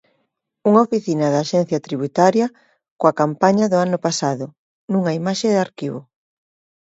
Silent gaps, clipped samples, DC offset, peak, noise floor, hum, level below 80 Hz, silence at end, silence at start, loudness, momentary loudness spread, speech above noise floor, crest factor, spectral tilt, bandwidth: 2.91-2.97 s, 4.58-4.88 s; under 0.1%; under 0.1%; 0 dBFS; -71 dBFS; none; -66 dBFS; 0.85 s; 0.65 s; -19 LUFS; 10 LU; 53 dB; 18 dB; -6 dB/octave; 8 kHz